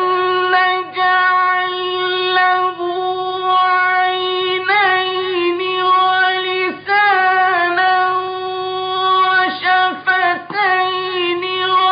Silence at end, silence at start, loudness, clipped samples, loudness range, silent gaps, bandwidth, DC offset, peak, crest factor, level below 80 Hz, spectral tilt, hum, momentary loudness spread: 0 s; 0 s; -15 LUFS; under 0.1%; 1 LU; none; 5.2 kHz; under 0.1%; -4 dBFS; 12 dB; -66 dBFS; -7.5 dB/octave; none; 6 LU